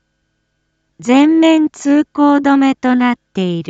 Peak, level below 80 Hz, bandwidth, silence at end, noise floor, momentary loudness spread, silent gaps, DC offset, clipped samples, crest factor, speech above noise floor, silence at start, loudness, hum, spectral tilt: 0 dBFS; -60 dBFS; 8 kHz; 0.05 s; -67 dBFS; 8 LU; none; under 0.1%; under 0.1%; 12 dB; 55 dB; 1 s; -12 LUFS; none; -5.5 dB/octave